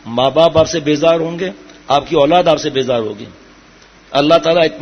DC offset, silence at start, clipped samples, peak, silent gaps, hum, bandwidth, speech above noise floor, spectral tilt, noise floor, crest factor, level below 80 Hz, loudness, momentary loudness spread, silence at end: under 0.1%; 0.05 s; under 0.1%; 0 dBFS; none; none; 6.6 kHz; 31 dB; -5 dB/octave; -43 dBFS; 14 dB; -46 dBFS; -13 LUFS; 11 LU; 0 s